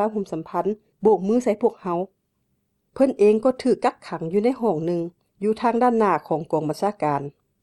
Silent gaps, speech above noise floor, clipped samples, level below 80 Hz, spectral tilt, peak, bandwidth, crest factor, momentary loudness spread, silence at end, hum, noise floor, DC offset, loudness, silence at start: none; 50 dB; under 0.1%; -64 dBFS; -7.5 dB/octave; -6 dBFS; 12.5 kHz; 16 dB; 10 LU; 0.35 s; none; -72 dBFS; under 0.1%; -22 LUFS; 0 s